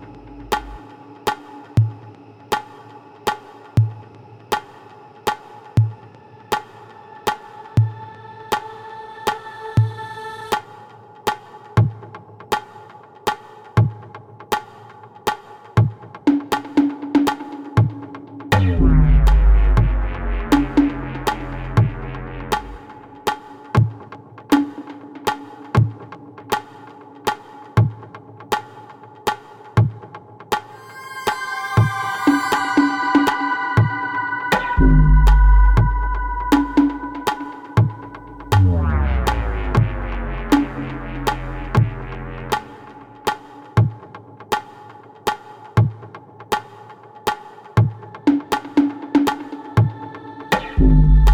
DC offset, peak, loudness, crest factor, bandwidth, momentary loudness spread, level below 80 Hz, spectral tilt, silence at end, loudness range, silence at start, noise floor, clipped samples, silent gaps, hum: under 0.1%; -2 dBFS; -20 LUFS; 18 dB; 17.5 kHz; 22 LU; -24 dBFS; -6.5 dB/octave; 0 s; 9 LU; 0 s; -43 dBFS; under 0.1%; none; none